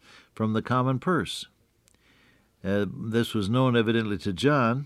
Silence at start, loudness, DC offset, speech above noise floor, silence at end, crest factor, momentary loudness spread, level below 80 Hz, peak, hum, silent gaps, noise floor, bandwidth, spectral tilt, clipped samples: 0.4 s; -26 LUFS; under 0.1%; 39 dB; 0 s; 18 dB; 10 LU; -62 dBFS; -10 dBFS; none; none; -64 dBFS; 14 kHz; -6.5 dB/octave; under 0.1%